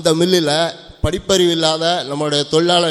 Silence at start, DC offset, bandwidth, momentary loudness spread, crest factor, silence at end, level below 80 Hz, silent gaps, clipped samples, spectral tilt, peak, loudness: 0 s; under 0.1%; 14 kHz; 8 LU; 16 dB; 0 s; -38 dBFS; none; under 0.1%; -4 dB/octave; 0 dBFS; -16 LUFS